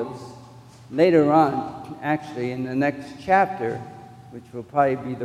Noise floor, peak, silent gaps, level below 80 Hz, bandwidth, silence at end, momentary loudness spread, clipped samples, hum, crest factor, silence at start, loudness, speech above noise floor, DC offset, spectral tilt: -45 dBFS; -4 dBFS; none; -60 dBFS; 13 kHz; 0 s; 22 LU; under 0.1%; none; 20 dB; 0 s; -22 LUFS; 23 dB; under 0.1%; -7.5 dB/octave